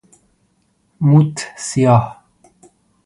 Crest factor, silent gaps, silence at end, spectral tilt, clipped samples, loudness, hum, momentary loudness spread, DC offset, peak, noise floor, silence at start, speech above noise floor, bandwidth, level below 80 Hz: 18 dB; none; 0.95 s; -7 dB/octave; under 0.1%; -15 LUFS; none; 12 LU; under 0.1%; 0 dBFS; -62 dBFS; 1 s; 48 dB; 11.5 kHz; -52 dBFS